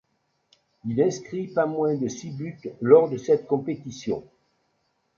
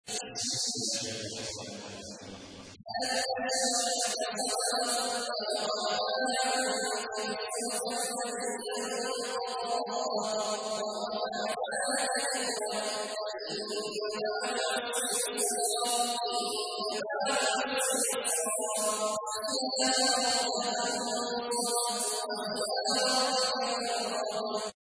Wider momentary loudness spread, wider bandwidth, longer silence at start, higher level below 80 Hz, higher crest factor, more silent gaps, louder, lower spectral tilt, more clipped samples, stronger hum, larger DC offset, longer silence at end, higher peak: first, 16 LU vs 7 LU; second, 7.4 kHz vs 11 kHz; first, 0.85 s vs 0.05 s; first, -66 dBFS vs -74 dBFS; first, 22 dB vs 16 dB; neither; first, -24 LUFS vs -30 LUFS; first, -7 dB/octave vs -0.5 dB/octave; neither; neither; neither; first, 0.95 s vs 0.1 s; first, -4 dBFS vs -16 dBFS